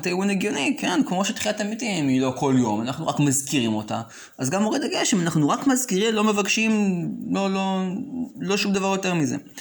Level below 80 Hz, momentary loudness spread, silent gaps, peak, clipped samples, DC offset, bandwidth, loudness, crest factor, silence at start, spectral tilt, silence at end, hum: -64 dBFS; 7 LU; none; -8 dBFS; under 0.1%; under 0.1%; over 20 kHz; -23 LUFS; 14 dB; 0 s; -4.5 dB/octave; 0 s; none